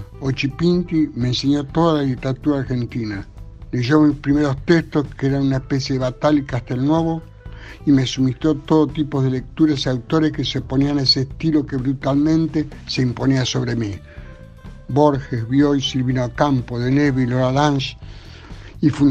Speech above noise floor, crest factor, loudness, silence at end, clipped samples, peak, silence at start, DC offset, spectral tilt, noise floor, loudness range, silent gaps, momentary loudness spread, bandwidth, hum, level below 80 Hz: 20 dB; 18 dB; -19 LUFS; 0 s; under 0.1%; 0 dBFS; 0 s; under 0.1%; -6.5 dB/octave; -38 dBFS; 2 LU; none; 11 LU; 8.2 kHz; none; -38 dBFS